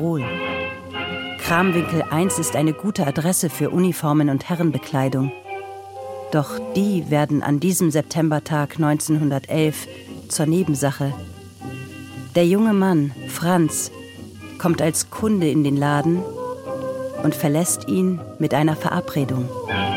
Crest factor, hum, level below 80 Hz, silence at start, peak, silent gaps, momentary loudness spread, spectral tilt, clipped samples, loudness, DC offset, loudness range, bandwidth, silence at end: 16 dB; none; -56 dBFS; 0 s; -4 dBFS; none; 14 LU; -5.5 dB/octave; under 0.1%; -21 LUFS; under 0.1%; 2 LU; 17 kHz; 0 s